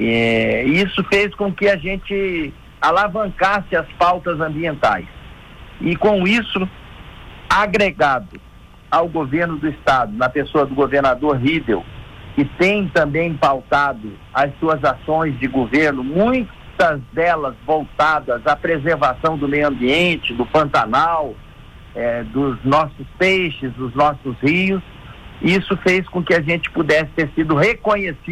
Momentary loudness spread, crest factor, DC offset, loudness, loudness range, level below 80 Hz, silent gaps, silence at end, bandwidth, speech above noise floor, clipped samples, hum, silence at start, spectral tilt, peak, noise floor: 7 LU; 14 dB; under 0.1%; -17 LUFS; 2 LU; -40 dBFS; none; 0 s; 15.5 kHz; 22 dB; under 0.1%; none; 0 s; -6 dB/octave; -4 dBFS; -40 dBFS